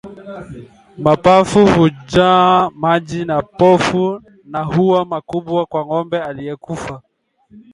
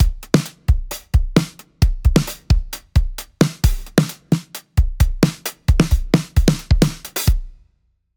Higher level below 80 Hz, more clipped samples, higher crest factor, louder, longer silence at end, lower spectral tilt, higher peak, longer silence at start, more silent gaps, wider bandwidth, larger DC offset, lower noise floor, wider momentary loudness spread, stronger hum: second, -44 dBFS vs -20 dBFS; neither; about the same, 16 dB vs 16 dB; first, -14 LUFS vs -19 LUFS; second, 0.15 s vs 0.65 s; about the same, -6.5 dB/octave vs -6 dB/octave; about the same, 0 dBFS vs 0 dBFS; about the same, 0.05 s vs 0 s; neither; second, 11.5 kHz vs over 20 kHz; neither; second, -47 dBFS vs -63 dBFS; first, 19 LU vs 5 LU; neither